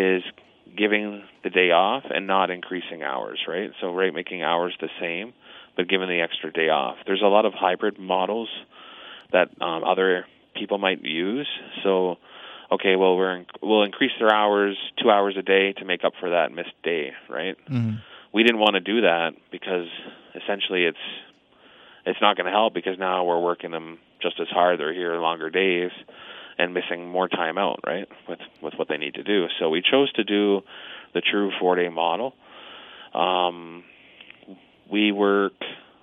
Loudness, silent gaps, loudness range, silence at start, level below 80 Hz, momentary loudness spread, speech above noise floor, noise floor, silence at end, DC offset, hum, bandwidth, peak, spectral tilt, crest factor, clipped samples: -23 LUFS; none; 5 LU; 0 s; -76 dBFS; 16 LU; 31 dB; -54 dBFS; 0.2 s; under 0.1%; none; 5.8 kHz; -2 dBFS; -7 dB/octave; 22 dB; under 0.1%